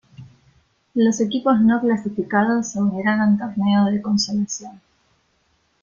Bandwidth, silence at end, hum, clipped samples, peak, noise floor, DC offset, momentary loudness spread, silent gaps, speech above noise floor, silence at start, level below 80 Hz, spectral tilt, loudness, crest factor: 7.4 kHz; 1.05 s; none; under 0.1%; -4 dBFS; -65 dBFS; under 0.1%; 7 LU; none; 46 dB; 0.2 s; -60 dBFS; -5 dB/octave; -20 LUFS; 16 dB